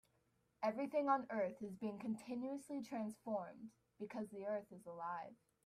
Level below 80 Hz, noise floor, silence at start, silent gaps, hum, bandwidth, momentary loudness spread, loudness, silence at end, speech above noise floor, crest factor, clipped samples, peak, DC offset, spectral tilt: -86 dBFS; -81 dBFS; 0.6 s; none; none; 14.5 kHz; 15 LU; -44 LUFS; 0.3 s; 37 dB; 20 dB; under 0.1%; -24 dBFS; under 0.1%; -6.5 dB/octave